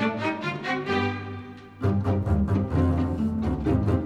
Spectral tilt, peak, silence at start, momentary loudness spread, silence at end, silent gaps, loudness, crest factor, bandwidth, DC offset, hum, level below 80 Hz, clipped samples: -8 dB/octave; -10 dBFS; 0 s; 8 LU; 0 s; none; -26 LUFS; 16 dB; 8.2 kHz; under 0.1%; none; -36 dBFS; under 0.1%